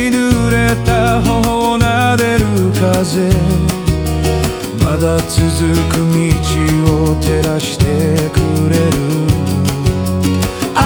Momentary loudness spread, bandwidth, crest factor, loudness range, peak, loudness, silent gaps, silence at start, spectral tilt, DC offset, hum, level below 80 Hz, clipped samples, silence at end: 3 LU; over 20 kHz; 12 dB; 1 LU; 0 dBFS; -13 LUFS; none; 0 s; -6 dB/octave; under 0.1%; none; -24 dBFS; under 0.1%; 0 s